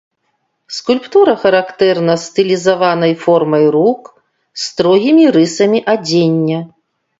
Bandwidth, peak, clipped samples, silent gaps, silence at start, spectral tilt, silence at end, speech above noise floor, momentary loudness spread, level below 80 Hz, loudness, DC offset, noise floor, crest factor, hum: 8 kHz; 0 dBFS; under 0.1%; none; 0.7 s; -5.5 dB/octave; 0.55 s; 54 dB; 13 LU; -58 dBFS; -12 LUFS; under 0.1%; -66 dBFS; 12 dB; none